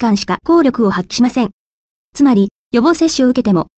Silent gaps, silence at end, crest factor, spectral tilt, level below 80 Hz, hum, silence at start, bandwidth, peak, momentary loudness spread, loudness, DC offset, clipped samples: 1.53-2.13 s, 2.51-2.71 s; 0.15 s; 12 dB; -5.5 dB/octave; -48 dBFS; none; 0 s; 8.6 kHz; -2 dBFS; 5 LU; -14 LUFS; under 0.1%; under 0.1%